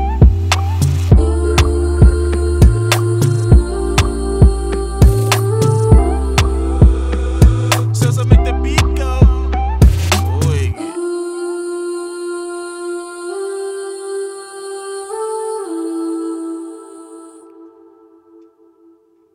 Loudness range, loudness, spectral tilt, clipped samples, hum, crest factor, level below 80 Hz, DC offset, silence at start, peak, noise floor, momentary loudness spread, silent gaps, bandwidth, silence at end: 11 LU; -15 LUFS; -6 dB/octave; under 0.1%; none; 14 dB; -16 dBFS; under 0.1%; 0 s; 0 dBFS; -50 dBFS; 13 LU; none; 16 kHz; 1.65 s